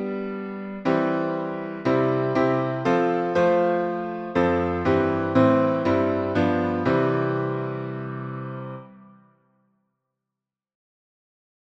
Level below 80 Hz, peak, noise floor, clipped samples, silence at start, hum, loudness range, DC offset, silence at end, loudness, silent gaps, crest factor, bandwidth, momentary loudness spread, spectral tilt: -56 dBFS; -6 dBFS; -87 dBFS; under 0.1%; 0 s; none; 14 LU; under 0.1%; 2.7 s; -23 LUFS; none; 18 dB; 7.8 kHz; 12 LU; -8.5 dB/octave